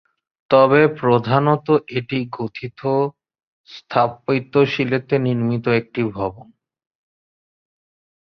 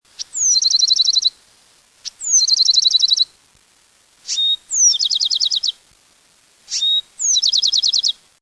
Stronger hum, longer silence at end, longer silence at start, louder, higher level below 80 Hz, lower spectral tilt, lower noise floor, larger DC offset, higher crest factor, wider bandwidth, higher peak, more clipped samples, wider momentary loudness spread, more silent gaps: neither; first, 1.85 s vs 0.3 s; first, 0.5 s vs 0.2 s; second, -19 LUFS vs -14 LUFS; first, -56 dBFS vs -68 dBFS; first, -8.5 dB/octave vs 5.5 dB/octave; first, under -90 dBFS vs -55 dBFS; neither; first, 20 dB vs 14 dB; second, 6.2 kHz vs 11 kHz; first, 0 dBFS vs -4 dBFS; neither; about the same, 11 LU vs 11 LU; first, 3.43-3.64 s vs none